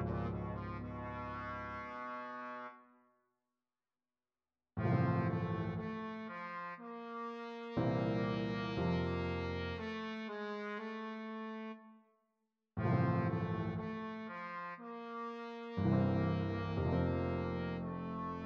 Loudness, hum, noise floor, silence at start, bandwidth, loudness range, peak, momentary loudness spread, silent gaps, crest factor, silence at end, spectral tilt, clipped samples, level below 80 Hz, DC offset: -39 LUFS; none; under -90 dBFS; 0 s; 6.6 kHz; 8 LU; -20 dBFS; 11 LU; none; 18 dB; 0 s; -9 dB/octave; under 0.1%; -58 dBFS; under 0.1%